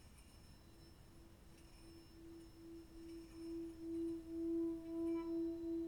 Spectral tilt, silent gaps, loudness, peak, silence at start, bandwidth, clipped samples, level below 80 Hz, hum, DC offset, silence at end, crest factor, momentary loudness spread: -7 dB/octave; none; -46 LUFS; -36 dBFS; 0 s; 18.5 kHz; under 0.1%; -66 dBFS; none; under 0.1%; 0 s; 12 dB; 21 LU